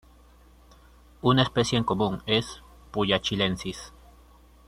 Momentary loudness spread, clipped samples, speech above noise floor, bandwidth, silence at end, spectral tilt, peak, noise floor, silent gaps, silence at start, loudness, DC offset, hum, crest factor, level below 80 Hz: 18 LU; under 0.1%; 29 dB; 14 kHz; 0.8 s; -5 dB/octave; -6 dBFS; -54 dBFS; none; 1.25 s; -25 LUFS; under 0.1%; none; 22 dB; -50 dBFS